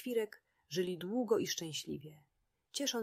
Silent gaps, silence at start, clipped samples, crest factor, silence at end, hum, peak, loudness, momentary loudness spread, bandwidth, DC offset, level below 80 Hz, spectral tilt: none; 0 s; under 0.1%; 18 dB; 0 s; none; -20 dBFS; -38 LUFS; 12 LU; 15.5 kHz; under 0.1%; -78 dBFS; -3.5 dB/octave